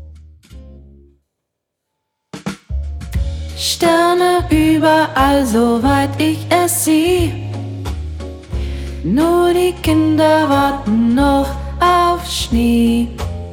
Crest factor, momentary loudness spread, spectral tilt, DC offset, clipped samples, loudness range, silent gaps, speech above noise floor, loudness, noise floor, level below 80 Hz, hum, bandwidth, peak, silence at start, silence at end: 14 dB; 13 LU; -5 dB/octave; under 0.1%; under 0.1%; 7 LU; none; 63 dB; -15 LUFS; -76 dBFS; -28 dBFS; none; 18 kHz; -2 dBFS; 0 s; 0 s